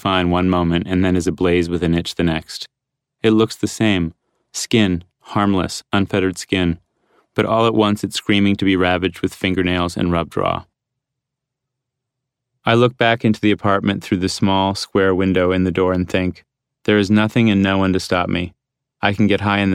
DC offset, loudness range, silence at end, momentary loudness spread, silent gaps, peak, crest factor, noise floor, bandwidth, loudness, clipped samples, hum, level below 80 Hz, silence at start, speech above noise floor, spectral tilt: under 0.1%; 4 LU; 0 s; 7 LU; none; -2 dBFS; 16 dB; -81 dBFS; 14.5 kHz; -18 LUFS; under 0.1%; none; -44 dBFS; 0.05 s; 64 dB; -5.5 dB/octave